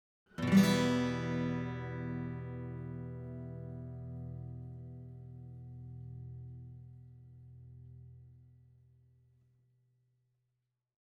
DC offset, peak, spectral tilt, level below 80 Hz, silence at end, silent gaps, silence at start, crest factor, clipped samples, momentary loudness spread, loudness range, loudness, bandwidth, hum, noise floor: under 0.1%; -16 dBFS; -6.5 dB/octave; -60 dBFS; 2.6 s; none; 0.35 s; 24 dB; under 0.1%; 26 LU; 25 LU; -36 LUFS; 19 kHz; none; -85 dBFS